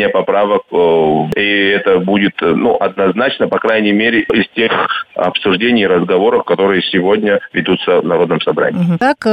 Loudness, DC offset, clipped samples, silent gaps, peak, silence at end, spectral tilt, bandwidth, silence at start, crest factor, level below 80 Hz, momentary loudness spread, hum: -12 LUFS; under 0.1%; under 0.1%; none; -2 dBFS; 0 s; -7 dB/octave; 8.8 kHz; 0 s; 10 dB; -50 dBFS; 3 LU; none